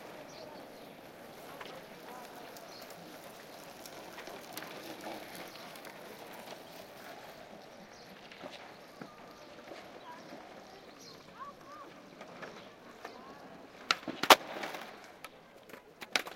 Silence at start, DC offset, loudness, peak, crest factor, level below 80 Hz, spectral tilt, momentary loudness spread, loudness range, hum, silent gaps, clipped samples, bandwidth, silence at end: 0 s; under 0.1%; -36 LUFS; -4 dBFS; 38 dB; -76 dBFS; -1.5 dB/octave; 16 LU; 18 LU; none; none; under 0.1%; 17 kHz; 0 s